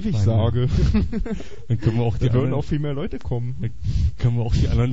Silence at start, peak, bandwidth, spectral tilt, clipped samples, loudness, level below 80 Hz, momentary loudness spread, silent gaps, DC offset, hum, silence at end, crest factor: 0 s; -8 dBFS; 7.8 kHz; -8.5 dB/octave; under 0.1%; -22 LUFS; -28 dBFS; 8 LU; none; 4%; none; 0 s; 14 dB